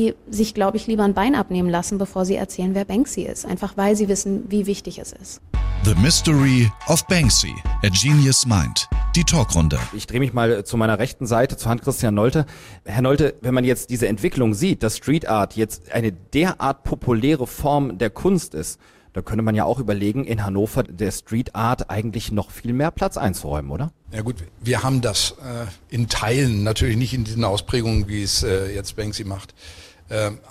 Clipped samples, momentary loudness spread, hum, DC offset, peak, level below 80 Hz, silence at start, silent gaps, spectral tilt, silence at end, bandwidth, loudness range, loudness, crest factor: under 0.1%; 12 LU; none; under 0.1%; -4 dBFS; -32 dBFS; 0 s; none; -5 dB/octave; 0.15 s; 16 kHz; 6 LU; -21 LUFS; 16 dB